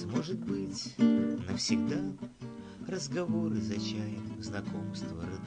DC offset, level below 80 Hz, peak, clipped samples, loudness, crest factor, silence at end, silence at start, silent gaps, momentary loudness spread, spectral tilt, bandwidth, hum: under 0.1%; -58 dBFS; -14 dBFS; under 0.1%; -33 LUFS; 20 dB; 0 s; 0 s; none; 12 LU; -5.5 dB/octave; 9.6 kHz; none